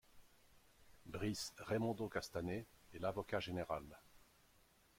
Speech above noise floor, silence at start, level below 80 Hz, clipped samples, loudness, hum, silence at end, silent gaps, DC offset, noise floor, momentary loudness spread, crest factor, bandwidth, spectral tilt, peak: 28 dB; 0.1 s; -68 dBFS; under 0.1%; -44 LUFS; none; 0.8 s; none; under 0.1%; -72 dBFS; 16 LU; 20 dB; 16.5 kHz; -5 dB/octave; -26 dBFS